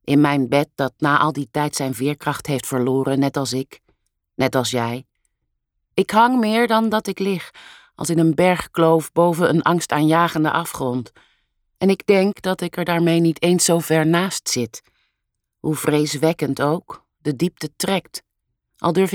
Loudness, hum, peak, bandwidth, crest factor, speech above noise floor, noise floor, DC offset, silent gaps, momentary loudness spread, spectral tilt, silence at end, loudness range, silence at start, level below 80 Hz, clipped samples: -19 LUFS; none; -2 dBFS; 18.5 kHz; 16 dB; 59 dB; -77 dBFS; under 0.1%; none; 11 LU; -5 dB/octave; 0 s; 5 LU; 0.05 s; -58 dBFS; under 0.1%